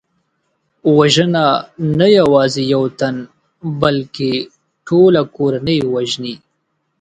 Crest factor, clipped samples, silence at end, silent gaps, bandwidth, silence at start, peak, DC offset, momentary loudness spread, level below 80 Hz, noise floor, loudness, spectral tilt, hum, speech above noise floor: 14 dB; under 0.1%; 0.65 s; none; 9.4 kHz; 0.85 s; 0 dBFS; under 0.1%; 13 LU; -50 dBFS; -68 dBFS; -14 LUFS; -6 dB/octave; none; 54 dB